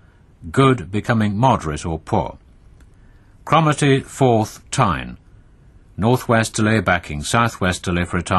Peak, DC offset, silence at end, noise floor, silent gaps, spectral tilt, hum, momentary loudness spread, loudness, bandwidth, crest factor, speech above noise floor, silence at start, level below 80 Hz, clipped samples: 0 dBFS; under 0.1%; 0 s; -48 dBFS; none; -5.5 dB/octave; none; 10 LU; -18 LUFS; 12.5 kHz; 18 dB; 30 dB; 0.4 s; -40 dBFS; under 0.1%